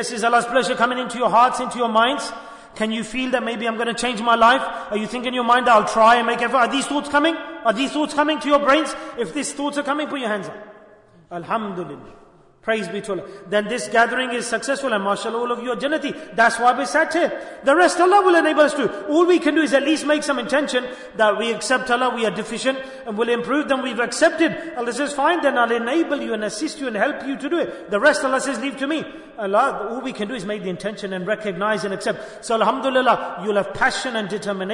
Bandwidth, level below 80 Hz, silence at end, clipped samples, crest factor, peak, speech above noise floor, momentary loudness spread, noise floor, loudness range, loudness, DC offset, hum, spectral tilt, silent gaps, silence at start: 11 kHz; -58 dBFS; 0 s; under 0.1%; 16 dB; -4 dBFS; 29 dB; 11 LU; -49 dBFS; 7 LU; -20 LUFS; under 0.1%; none; -3.5 dB/octave; none; 0 s